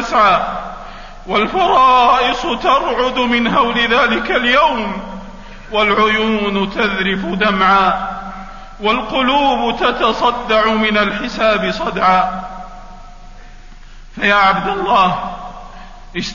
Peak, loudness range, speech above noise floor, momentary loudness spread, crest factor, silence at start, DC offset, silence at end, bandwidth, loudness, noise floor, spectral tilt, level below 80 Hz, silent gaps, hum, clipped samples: 0 dBFS; 4 LU; 21 dB; 18 LU; 14 dB; 0 s; under 0.1%; 0 s; 7.4 kHz; -14 LUFS; -35 dBFS; -4.5 dB/octave; -34 dBFS; none; none; under 0.1%